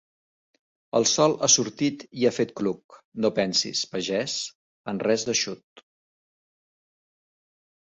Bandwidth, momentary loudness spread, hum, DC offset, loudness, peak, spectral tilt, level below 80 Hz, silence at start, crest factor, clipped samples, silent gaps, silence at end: 8.4 kHz; 15 LU; none; under 0.1%; -24 LUFS; -6 dBFS; -2.5 dB/octave; -68 dBFS; 0.95 s; 22 dB; under 0.1%; 2.84-2.89 s, 3.05-3.12 s, 4.55-4.84 s, 5.63-5.76 s; 2.1 s